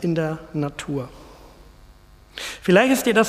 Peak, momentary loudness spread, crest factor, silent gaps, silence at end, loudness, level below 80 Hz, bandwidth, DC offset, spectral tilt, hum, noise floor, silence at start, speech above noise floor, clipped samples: -2 dBFS; 17 LU; 20 dB; none; 0 s; -22 LUFS; -50 dBFS; 15.5 kHz; under 0.1%; -5 dB/octave; none; -49 dBFS; 0 s; 29 dB; under 0.1%